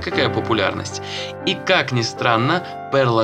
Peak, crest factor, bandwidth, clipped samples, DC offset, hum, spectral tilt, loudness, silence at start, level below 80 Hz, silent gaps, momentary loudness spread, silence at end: 0 dBFS; 20 dB; 10 kHz; under 0.1%; under 0.1%; none; -5 dB/octave; -20 LUFS; 0 s; -54 dBFS; none; 9 LU; 0 s